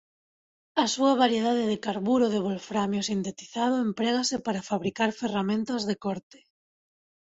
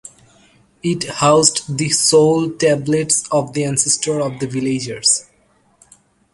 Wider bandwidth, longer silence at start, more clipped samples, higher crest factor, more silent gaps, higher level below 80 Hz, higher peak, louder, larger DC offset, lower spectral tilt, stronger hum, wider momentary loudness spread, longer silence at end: second, 8 kHz vs 11.5 kHz; about the same, 0.75 s vs 0.85 s; neither; about the same, 18 dB vs 18 dB; neither; second, -66 dBFS vs -54 dBFS; second, -10 dBFS vs 0 dBFS; second, -27 LUFS vs -16 LUFS; neither; about the same, -4.5 dB/octave vs -3.5 dB/octave; neither; about the same, 8 LU vs 10 LU; about the same, 1.1 s vs 1.1 s